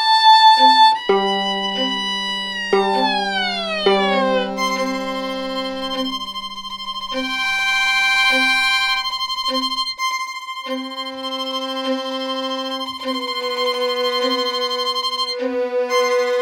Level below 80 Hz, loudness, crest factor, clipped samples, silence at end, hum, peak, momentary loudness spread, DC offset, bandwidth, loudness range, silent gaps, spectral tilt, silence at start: -54 dBFS; -18 LUFS; 18 dB; under 0.1%; 0 s; none; -2 dBFS; 11 LU; under 0.1%; 18 kHz; 6 LU; none; -2.5 dB/octave; 0 s